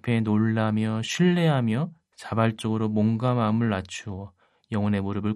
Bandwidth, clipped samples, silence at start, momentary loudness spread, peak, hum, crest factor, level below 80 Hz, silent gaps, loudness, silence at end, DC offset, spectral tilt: 11.5 kHz; under 0.1%; 0.05 s; 12 LU; -8 dBFS; none; 16 dB; -64 dBFS; none; -25 LUFS; 0 s; under 0.1%; -7 dB/octave